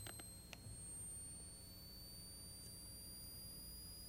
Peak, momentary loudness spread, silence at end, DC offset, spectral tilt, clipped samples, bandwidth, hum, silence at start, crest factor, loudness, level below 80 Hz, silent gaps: -32 dBFS; 5 LU; 0 s; under 0.1%; -2.5 dB/octave; under 0.1%; 16 kHz; none; 0 s; 22 dB; -53 LUFS; -64 dBFS; none